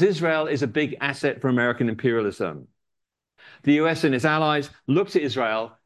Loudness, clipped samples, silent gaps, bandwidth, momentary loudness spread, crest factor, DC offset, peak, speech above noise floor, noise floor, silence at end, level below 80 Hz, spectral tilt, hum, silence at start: -23 LUFS; under 0.1%; none; 12.5 kHz; 6 LU; 18 dB; under 0.1%; -6 dBFS; 59 dB; -82 dBFS; 0.15 s; -62 dBFS; -6.5 dB/octave; none; 0 s